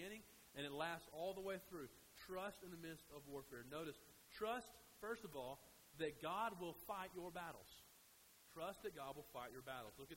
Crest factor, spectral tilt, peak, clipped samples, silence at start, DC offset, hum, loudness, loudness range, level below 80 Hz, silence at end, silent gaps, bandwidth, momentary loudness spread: 20 dB; -4 dB/octave; -32 dBFS; under 0.1%; 0 s; under 0.1%; none; -52 LUFS; 4 LU; -76 dBFS; 0 s; none; 16 kHz; 14 LU